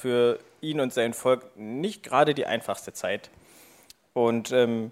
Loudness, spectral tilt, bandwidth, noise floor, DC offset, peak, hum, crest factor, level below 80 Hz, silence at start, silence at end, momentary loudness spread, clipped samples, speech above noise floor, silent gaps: -27 LUFS; -5 dB/octave; 15.5 kHz; -55 dBFS; under 0.1%; -6 dBFS; none; 20 dB; -72 dBFS; 0 s; 0 s; 10 LU; under 0.1%; 30 dB; none